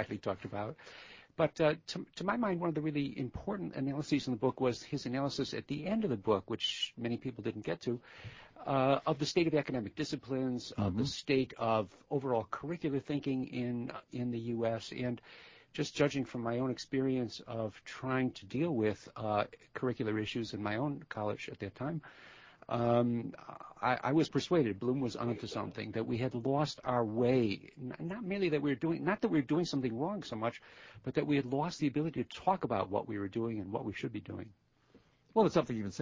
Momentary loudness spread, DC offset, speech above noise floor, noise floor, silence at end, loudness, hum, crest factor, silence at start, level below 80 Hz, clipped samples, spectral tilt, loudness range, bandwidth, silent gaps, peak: 11 LU; under 0.1%; 31 dB; -66 dBFS; 0 s; -35 LUFS; none; 20 dB; 0 s; -64 dBFS; under 0.1%; -6.5 dB/octave; 3 LU; 7.6 kHz; none; -16 dBFS